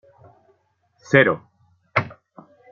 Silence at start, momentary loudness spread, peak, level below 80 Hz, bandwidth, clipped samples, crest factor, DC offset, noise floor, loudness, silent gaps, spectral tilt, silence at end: 1.1 s; 14 LU; -2 dBFS; -64 dBFS; 7.4 kHz; under 0.1%; 22 dB; under 0.1%; -65 dBFS; -20 LUFS; none; -4.5 dB/octave; 0.65 s